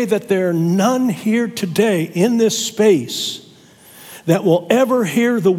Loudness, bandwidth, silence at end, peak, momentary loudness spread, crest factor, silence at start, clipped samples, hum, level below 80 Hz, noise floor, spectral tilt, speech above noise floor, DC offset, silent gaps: -16 LUFS; 17 kHz; 0 s; 0 dBFS; 8 LU; 16 dB; 0 s; under 0.1%; none; -66 dBFS; -45 dBFS; -5 dB/octave; 29 dB; under 0.1%; none